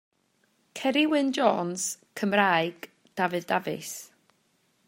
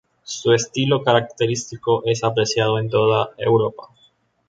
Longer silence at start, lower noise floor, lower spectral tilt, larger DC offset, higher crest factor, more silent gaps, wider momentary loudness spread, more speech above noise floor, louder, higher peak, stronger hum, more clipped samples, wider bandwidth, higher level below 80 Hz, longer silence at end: first, 0.75 s vs 0.25 s; first, -70 dBFS vs -59 dBFS; second, -3.5 dB/octave vs -5 dB/octave; neither; about the same, 22 dB vs 18 dB; neither; first, 16 LU vs 6 LU; first, 44 dB vs 40 dB; second, -26 LUFS vs -19 LUFS; second, -6 dBFS vs -2 dBFS; neither; neither; first, 16 kHz vs 9.2 kHz; second, -80 dBFS vs -58 dBFS; first, 0.8 s vs 0.65 s